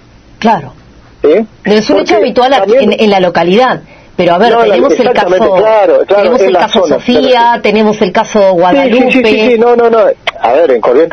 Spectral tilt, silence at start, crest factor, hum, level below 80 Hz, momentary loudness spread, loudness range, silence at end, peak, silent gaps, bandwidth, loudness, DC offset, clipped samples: -5.5 dB/octave; 0.4 s; 8 dB; none; -42 dBFS; 5 LU; 1 LU; 0 s; 0 dBFS; none; 7.2 kHz; -7 LUFS; under 0.1%; 0.9%